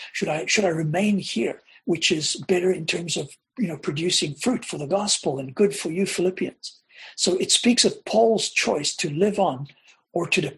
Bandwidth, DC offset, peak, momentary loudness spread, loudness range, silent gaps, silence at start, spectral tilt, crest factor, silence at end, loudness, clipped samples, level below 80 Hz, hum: 12.5 kHz; under 0.1%; -4 dBFS; 11 LU; 3 LU; none; 0 s; -3.5 dB/octave; 18 dB; 0 s; -23 LUFS; under 0.1%; -62 dBFS; none